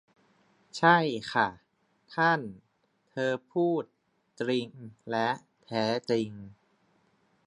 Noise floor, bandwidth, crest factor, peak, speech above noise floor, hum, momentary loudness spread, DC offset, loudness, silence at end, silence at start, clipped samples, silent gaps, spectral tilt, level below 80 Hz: -72 dBFS; 10.5 kHz; 24 dB; -6 dBFS; 43 dB; none; 19 LU; under 0.1%; -29 LUFS; 0.95 s; 0.75 s; under 0.1%; none; -5.5 dB/octave; -72 dBFS